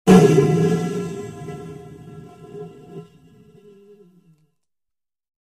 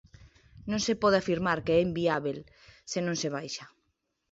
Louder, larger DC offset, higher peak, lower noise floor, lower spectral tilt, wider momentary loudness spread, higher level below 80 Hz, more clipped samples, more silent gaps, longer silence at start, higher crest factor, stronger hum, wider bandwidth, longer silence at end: first, -17 LUFS vs -29 LUFS; neither; first, 0 dBFS vs -12 dBFS; first, -86 dBFS vs -78 dBFS; first, -7 dB/octave vs -4.5 dB/octave; first, 27 LU vs 15 LU; first, -50 dBFS vs -58 dBFS; neither; neither; second, 0.05 s vs 0.2 s; about the same, 20 dB vs 18 dB; neither; first, 14 kHz vs 8 kHz; first, 2.5 s vs 0.65 s